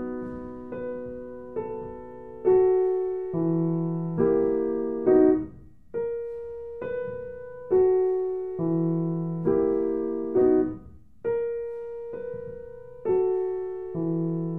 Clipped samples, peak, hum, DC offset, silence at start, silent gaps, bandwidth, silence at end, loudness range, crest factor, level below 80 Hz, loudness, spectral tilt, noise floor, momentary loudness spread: under 0.1%; -10 dBFS; none; 0.3%; 0 s; none; 2.8 kHz; 0 s; 4 LU; 16 dB; -54 dBFS; -26 LUFS; -12.5 dB/octave; -47 dBFS; 16 LU